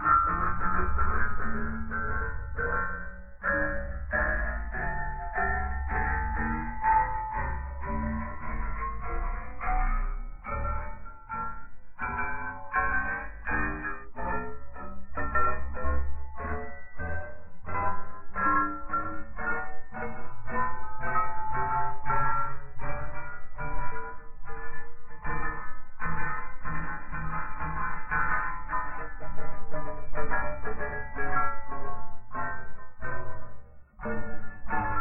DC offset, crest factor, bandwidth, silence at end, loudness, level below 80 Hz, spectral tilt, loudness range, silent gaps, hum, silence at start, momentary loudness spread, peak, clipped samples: under 0.1%; 14 dB; 2.8 kHz; 0 s; -32 LUFS; -36 dBFS; -11.5 dB/octave; 6 LU; none; none; 0 s; 13 LU; -10 dBFS; under 0.1%